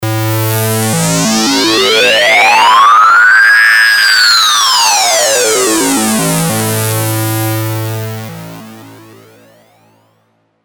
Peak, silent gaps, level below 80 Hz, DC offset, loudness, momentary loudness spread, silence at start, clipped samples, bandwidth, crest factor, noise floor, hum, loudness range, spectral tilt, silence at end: 0 dBFS; none; -48 dBFS; under 0.1%; -7 LUFS; 12 LU; 0 s; under 0.1%; over 20 kHz; 10 dB; -56 dBFS; none; 13 LU; -2.5 dB/octave; 1.7 s